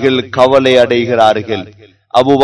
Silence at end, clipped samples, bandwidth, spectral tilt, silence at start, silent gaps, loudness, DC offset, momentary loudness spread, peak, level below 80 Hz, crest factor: 0 s; 2%; 11 kHz; -5.5 dB/octave; 0 s; none; -11 LUFS; under 0.1%; 9 LU; 0 dBFS; -50 dBFS; 10 dB